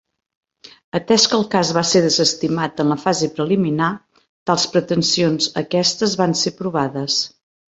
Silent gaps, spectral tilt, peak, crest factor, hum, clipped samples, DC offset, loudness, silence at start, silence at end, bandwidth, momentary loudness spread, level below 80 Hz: 4.29-4.46 s; -4 dB/octave; 0 dBFS; 18 dB; none; under 0.1%; under 0.1%; -18 LUFS; 0.95 s; 0.45 s; 8.2 kHz; 7 LU; -58 dBFS